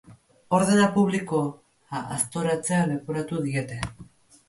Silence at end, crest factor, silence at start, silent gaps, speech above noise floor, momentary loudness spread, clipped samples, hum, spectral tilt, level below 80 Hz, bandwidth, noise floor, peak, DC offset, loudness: 0.45 s; 20 dB; 0.1 s; none; 26 dB; 14 LU; under 0.1%; none; -5.5 dB/octave; -56 dBFS; 11.5 kHz; -50 dBFS; -6 dBFS; under 0.1%; -25 LUFS